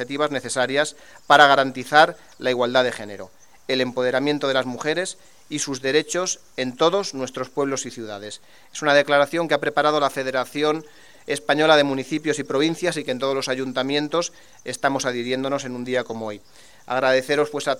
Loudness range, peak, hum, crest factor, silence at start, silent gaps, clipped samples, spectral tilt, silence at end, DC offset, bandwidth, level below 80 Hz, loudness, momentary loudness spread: 5 LU; 0 dBFS; none; 22 dB; 0 s; none; under 0.1%; -3.5 dB/octave; 0 s; 0.3%; 16.5 kHz; -66 dBFS; -21 LUFS; 15 LU